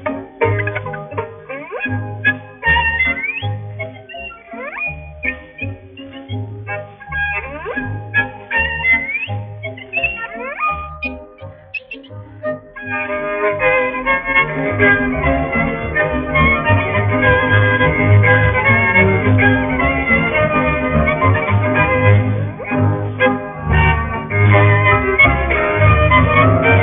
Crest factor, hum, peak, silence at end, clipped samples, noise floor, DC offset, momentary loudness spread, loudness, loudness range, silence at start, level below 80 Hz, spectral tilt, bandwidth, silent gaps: 16 dB; none; 0 dBFS; 0 s; under 0.1%; -36 dBFS; under 0.1%; 16 LU; -15 LUFS; 11 LU; 0 s; -30 dBFS; -5 dB/octave; 3.8 kHz; none